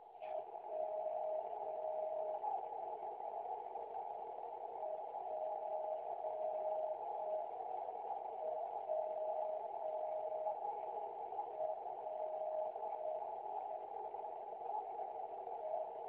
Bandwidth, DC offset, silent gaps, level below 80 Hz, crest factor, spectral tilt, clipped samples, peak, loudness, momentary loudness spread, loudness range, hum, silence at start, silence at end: 4 kHz; under 0.1%; none; under -90 dBFS; 14 dB; -3.5 dB/octave; under 0.1%; -28 dBFS; -44 LUFS; 5 LU; 2 LU; none; 0 s; 0 s